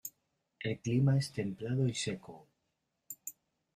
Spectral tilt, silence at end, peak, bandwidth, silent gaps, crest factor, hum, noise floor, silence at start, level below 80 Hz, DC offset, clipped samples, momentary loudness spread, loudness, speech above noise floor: -6 dB/octave; 0.45 s; -18 dBFS; 15.5 kHz; none; 18 dB; none; -83 dBFS; 0.05 s; -70 dBFS; under 0.1%; under 0.1%; 18 LU; -35 LUFS; 50 dB